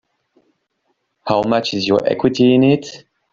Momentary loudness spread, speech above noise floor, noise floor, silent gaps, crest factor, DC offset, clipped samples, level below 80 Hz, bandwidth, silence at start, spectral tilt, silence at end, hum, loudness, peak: 9 LU; 54 dB; -69 dBFS; none; 16 dB; under 0.1%; under 0.1%; -56 dBFS; 7.6 kHz; 1.25 s; -6.5 dB/octave; 0.35 s; none; -16 LUFS; -2 dBFS